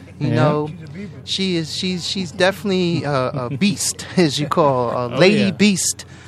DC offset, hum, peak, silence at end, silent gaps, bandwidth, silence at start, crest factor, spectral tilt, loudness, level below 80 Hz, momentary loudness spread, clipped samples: under 0.1%; none; 0 dBFS; 0 s; none; 13.5 kHz; 0 s; 18 dB; -4.5 dB/octave; -18 LUFS; -56 dBFS; 8 LU; under 0.1%